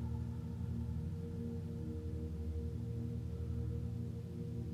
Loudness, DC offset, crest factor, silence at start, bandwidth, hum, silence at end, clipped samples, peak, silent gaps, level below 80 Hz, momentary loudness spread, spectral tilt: -43 LUFS; under 0.1%; 12 dB; 0 s; 12.5 kHz; none; 0 s; under 0.1%; -30 dBFS; none; -50 dBFS; 2 LU; -9.5 dB/octave